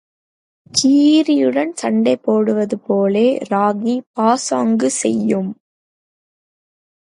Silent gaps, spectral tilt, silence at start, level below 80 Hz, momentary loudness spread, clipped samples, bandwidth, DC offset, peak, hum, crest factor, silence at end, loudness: 4.06-4.14 s; -4.5 dB/octave; 0.75 s; -66 dBFS; 7 LU; under 0.1%; 11.5 kHz; under 0.1%; -2 dBFS; none; 16 dB; 1.5 s; -16 LUFS